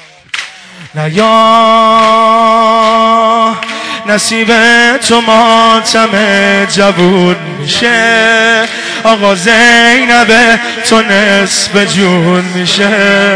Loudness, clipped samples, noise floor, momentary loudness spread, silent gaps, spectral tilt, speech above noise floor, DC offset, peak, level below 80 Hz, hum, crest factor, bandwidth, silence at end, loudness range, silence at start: -6 LUFS; 1%; -28 dBFS; 8 LU; none; -3.5 dB/octave; 22 dB; 0.9%; 0 dBFS; -44 dBFS; none; 8 dB; 11 kHz; 0 s; 2 LU; 0.35 s